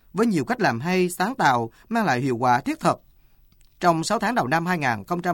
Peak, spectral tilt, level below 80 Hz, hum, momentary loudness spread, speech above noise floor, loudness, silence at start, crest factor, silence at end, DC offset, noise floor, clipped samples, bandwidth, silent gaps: -6 dBFS; -5.5 dB/octave; -56 dBFS; none; 4 LU; 33 dB; -23 LUFS; 0.15 s; 18 dB; 0 s; under 0.1%; -55 dBFS; under 0.1%; 19 kHz; none